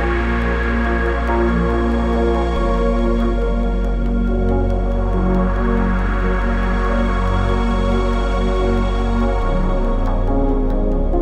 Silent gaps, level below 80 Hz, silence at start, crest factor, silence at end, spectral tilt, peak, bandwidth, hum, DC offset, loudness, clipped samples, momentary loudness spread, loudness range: none; -18 dBFS; 0 s; 12 dB; 0 s; -8 dB/octave; -6 dBFS; 7.8 kHz; none; under 0.1%; -19 LUFS; under 0.1%; 2 LU; 1 LU